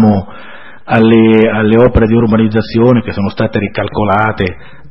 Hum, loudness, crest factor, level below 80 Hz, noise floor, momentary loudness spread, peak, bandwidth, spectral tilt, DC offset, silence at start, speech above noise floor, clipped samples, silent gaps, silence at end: none; -11 LUFS; 10 dB; -30 dBFS; -34 dBFS; 10 LU; 0 dBFS; 5.8 kHz; -10 dB/octave; 3%; 0 s; 24 dB; 0.3%; none; 0.35 s